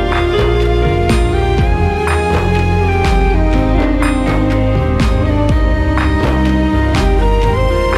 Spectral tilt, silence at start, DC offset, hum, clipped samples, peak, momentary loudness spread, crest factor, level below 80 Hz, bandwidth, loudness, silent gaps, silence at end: -7 dB/octave; 0 s; under 0.1%; none; under 0.1%; 0 dBFS; 1 LU; 12 dB; -16 dBFS; 11.5 kHz; -13 LUFS; none; 0 s